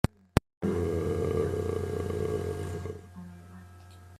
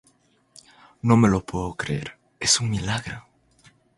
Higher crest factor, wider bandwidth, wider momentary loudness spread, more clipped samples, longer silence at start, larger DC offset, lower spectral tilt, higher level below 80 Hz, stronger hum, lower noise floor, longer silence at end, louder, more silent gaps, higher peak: first, 30 dB vs 22 dB; first, 15 kHz vs 11.5 kHz; first, 20 LU vs 16 LU; neither; second, 0.35 s vs 1.05 s; neither; first, -7 dB/octave vs -4 dB/octave; about the same, -48 dBFS vs -46 dBFS; neither; second, -50 dBFS vs -62 dBFS; second, 0 s vs 0.8 s; second, -32 LUFS vs -23 LUFS; first, 0.57-0.61 s vs none; about the same, -2 dBFS vs -2 dBFS